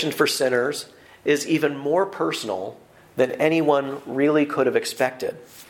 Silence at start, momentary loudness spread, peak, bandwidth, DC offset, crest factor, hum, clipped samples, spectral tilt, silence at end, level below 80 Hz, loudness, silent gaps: 0 s; 11 LU; -4 dBFS; 17 kHz; under 0.1%; 18 dB; none; under 0.1%; -4.5 dB/octave; 0.05 s; -68 dBFS; -22 LUFS; none